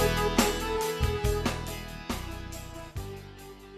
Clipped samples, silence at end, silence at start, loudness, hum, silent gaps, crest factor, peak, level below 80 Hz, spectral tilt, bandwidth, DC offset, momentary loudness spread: under 0.1%; 0 s; 0 s; -31 LUFS; none; none; 22 dB; -10 dBFS; -38 dBFS; -4.5 dB/octave; 14 kHz; under 0.1%; 16 LU